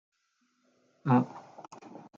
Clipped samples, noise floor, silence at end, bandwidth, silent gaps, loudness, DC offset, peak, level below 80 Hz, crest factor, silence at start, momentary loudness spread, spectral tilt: under 0.1%; -75 dBFS; 0.55 s; 7.2 kHz; none; -29 LUFS; under 0.1%; -14 dBFS; -80 dBFS; 20 dB; 1.05 s; 23 LU; -9 dB/octave